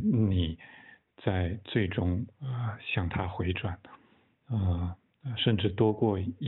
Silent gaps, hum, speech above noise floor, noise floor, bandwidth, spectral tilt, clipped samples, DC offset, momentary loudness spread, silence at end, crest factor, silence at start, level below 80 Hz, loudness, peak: none; none; 32 dB; -62 dBFS; 4.1 kHz; -6 dB/octave; under 0.1%; under 0.1%; 12 LU; 0 s; 18 dB; 0 s; -48 dBFS; -31 LUFS; -12 dBFS